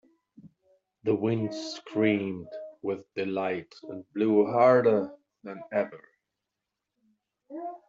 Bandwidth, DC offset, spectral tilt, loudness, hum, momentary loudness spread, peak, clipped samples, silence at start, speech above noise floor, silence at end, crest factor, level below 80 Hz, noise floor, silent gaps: 7.6 kHz; under 0.1%; -5.5 dB/octave; -27 LUFS; none; 21 LU; -10 dBFS; under 0.1%; 0.45 s; 59 dB; 0.1 s; 20 dB; -76 dBFS; -86 dBFS; none